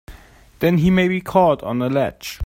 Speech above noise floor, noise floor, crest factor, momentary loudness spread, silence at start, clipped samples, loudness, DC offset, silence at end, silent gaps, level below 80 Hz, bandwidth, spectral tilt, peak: 27 dB; -44 dBFS; 18 dB; 6 LU; 0.1 s; under 0.1%; -18 LUFS; under 0.1%; 0 s; none; -44 dBFS; 16.5 kHz; -7 dB/octave; 0 dBFS